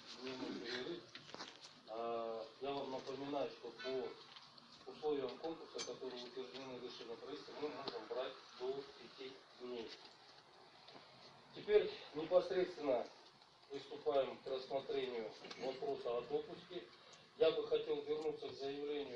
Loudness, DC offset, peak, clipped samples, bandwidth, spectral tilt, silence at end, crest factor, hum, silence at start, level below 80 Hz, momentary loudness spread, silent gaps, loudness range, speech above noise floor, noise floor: -44 LUFS; under 0.1%; -22 dBFS; under 0.1%; 9 kHz; -4.5 dB/octave; 0 s; 22 dB; none; 0 s; -80 dBFS; 21 LU; none; 8 LU; 22 dB; -65 dBFS